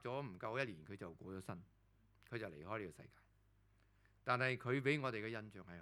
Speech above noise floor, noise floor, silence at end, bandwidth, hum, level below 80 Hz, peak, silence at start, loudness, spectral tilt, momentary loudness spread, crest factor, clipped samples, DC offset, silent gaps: 29 dB; -73 dBFS; 0 s; 13.5 kHz; none; -76 dBFS; -22 dBFS; 0 s; -44 LUFS; -6.5 dB/octave; 15 LU; 24 dB; under 0.1%; under 0.1%; none